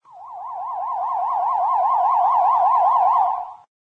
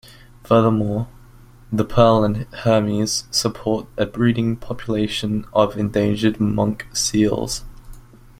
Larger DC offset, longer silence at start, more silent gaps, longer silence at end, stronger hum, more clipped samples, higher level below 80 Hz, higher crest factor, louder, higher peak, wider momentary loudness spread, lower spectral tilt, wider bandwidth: neither; second, 0.15 s vs 0.45 s; neither; about the same, 0.3 s vs 0.4 s; neither; neither; second, -70 dBFS vs -42 dBFS; second, 12 dB vs 18 dB; about the same, -19 LUFS vs -20 LUFS; second, -8 dBFS vs -2 dBFS; first, 15 LU vs 9 LU; second, -4 dB/octave vs -5.5 dB/octave; second, 5.6 kHz vs 16 kHz